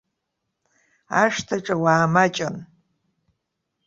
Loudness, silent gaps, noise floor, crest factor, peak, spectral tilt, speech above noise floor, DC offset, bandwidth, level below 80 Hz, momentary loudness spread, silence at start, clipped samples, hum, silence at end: -21 LUFS; none; -79 dBFS; 22 dB; -2 dBFS; -5 dB/octave; 58 dB; under 0.1%; 7.8 kHz; -62 dBFS; 11 LU; 1.1 s; under 0.1%; none; 1.2 s